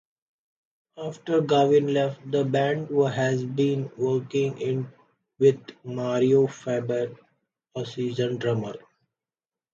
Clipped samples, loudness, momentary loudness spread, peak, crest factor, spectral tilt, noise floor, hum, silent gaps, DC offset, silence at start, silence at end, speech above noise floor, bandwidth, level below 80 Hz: under 0.1%; -25 LUFS; 15 LU; -8 dBFS; 18 dB; -7 dB/octave; under -90 dBFS; none; none; under 0.1%; 0.95 s; 0.95 s; over 66 dB; 7.6 kHz; -70 dBFS